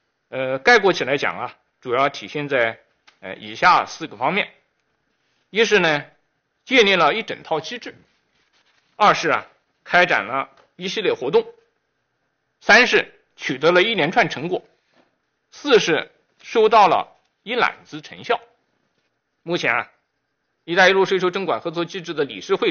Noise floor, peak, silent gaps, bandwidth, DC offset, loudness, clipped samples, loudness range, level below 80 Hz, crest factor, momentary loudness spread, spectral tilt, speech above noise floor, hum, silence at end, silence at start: -73 dBFS; -4 dBFS; none; 7 kHz; under 0.1%; -19 LUFS; under 0.1%; 4 LU; -62 dBFS; 18 dB; 19 LU; -1.5 dB/octave; 54 dB; none; 0 s; 0.3 s